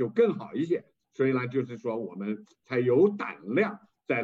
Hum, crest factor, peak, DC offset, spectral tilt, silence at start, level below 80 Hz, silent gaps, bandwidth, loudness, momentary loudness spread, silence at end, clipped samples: none; 16 dB; -12 dBFS; under 0.1%; -8.5 dB/octave; 0 s; -82 dBFS; none; 7.4 kHz; -28 LUFS; 12 LU; 0 s; under 0.1%